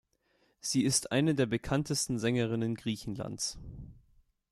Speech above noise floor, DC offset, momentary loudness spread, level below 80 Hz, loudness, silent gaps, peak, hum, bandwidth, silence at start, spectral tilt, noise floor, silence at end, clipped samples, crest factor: 41 dB; under 0.1%; 12 LU; -56 dBFS; -31 LUFS; none; -16 dBFS; none; 14 kHz; 0.65 s; -4.5 dB/octave; -72 dBFS; 0.55 s; under 0.1%; 18 dB